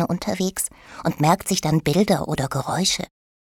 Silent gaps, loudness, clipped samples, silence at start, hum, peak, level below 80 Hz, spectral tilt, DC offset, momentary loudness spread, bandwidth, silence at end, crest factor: none; -22 LUFS; under 0.1%; 0 s; none; -4 dBFS; -48 dBFS; -4.5 dB/octave; under 0.1%; 8 LU; 18.5 kHz; 0.4 s; 18 dB